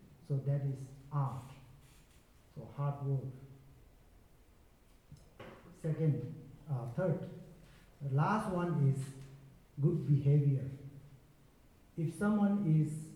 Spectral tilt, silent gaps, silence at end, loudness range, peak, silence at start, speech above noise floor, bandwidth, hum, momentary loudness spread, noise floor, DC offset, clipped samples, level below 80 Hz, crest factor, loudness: -9 dB/octave; none; 0 s; 10 LU; -20 dBFS; 0 s; 30 dB; 11.5 kHz; none; 23 LU; -64 dBFS; under 0.1%; under 0.1%; -66 dBFS; 16 dB; -35 LUFS